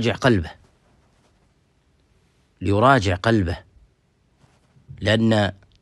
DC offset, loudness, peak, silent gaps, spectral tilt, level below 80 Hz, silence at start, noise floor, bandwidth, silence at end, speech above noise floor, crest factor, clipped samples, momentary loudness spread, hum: under 0.1%; -20 LUFS; -2 dBFS; none; -6.5 dB/octave; -46 dBFS; 0 s; -63 dBFS; 11.5 kHz; 0.3 s; 44 dB; 22 dB; under 0.1%; 13 LU; none